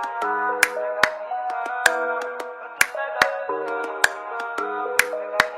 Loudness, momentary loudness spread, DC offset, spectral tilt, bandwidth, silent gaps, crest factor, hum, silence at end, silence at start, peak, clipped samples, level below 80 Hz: -23 LUFS; 8 LU; under 0.1%; -0.5 dB/octave; 16 kHz; none; 24 dB; none; 0 s; 0 s; 0 dBFS; under 0.1%; -62 dBFS